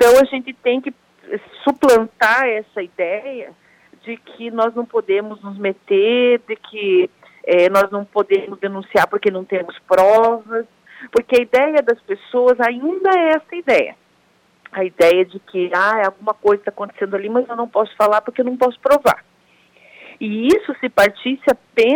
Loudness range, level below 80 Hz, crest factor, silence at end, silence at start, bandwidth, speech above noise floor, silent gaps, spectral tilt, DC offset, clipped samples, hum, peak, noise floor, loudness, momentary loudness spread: 3 LU; -56 dBFS; 14 dB; 0 s; 0 s; 17 kHz; 41 dB; none; -4.5 dB/octave; under 0.1%; under 0.1%; none; -4 dBFS; -57 dBFS; -17 LUFS; 12 LU